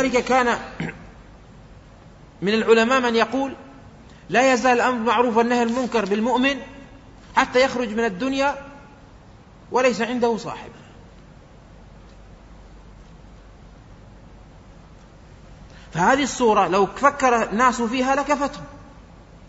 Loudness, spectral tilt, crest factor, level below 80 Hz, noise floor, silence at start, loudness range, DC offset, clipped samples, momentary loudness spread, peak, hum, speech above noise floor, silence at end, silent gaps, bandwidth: -20 LUFS; -4 dB/octave; 20 dB; -48 dBFS; -46 dBFS; 0 s; 7 LU; under 0.1%; under 0.1%; 15 LU; -2 dBFS; none; 27 dB; 0.05 s; none; 8 kHz